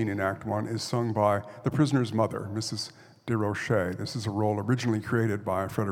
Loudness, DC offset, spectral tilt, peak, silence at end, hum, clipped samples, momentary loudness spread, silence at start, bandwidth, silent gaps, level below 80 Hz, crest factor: -28 LUFS; under 0.1%; -6 dB/octave; -10 dBFS; 0 s; none; under 0.1%; 7 LU; 0 s; 16 kHz; none; -64 dBFS; 18 dB